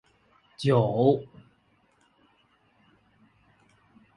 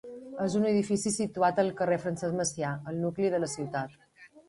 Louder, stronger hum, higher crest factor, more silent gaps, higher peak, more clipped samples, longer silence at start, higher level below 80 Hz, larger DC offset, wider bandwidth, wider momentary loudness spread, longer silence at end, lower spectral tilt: first, -25 LUFS vs -30 LUFS; neither; about the same, 22 dB vs 18 dB; neither; first, -8 dBFS vs -12 dBFS; neither; first, 0.6 s vs 0.05 s; about the same, -66 dBFS vs -66 dBFS; neither; about the same, 11 kHz vs 11.5 kHz; about the same, 10 LU vs 8 LU; first, 2.95 s vs 0.1 s; first, -8 dB/octave vs -5 dB/octave